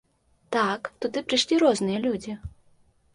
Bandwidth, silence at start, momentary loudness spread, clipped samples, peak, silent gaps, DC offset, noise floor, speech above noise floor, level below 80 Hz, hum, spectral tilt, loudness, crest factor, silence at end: 11.5 kHz; 0.5 s; 15 LU; under 0.1%; -8 dBFS; none; under 0.1%; -61 dBFS; 36 dB; -54 dBFS; none; -4 dB/octave; -25 LUFS; 18 dB; 0.65 s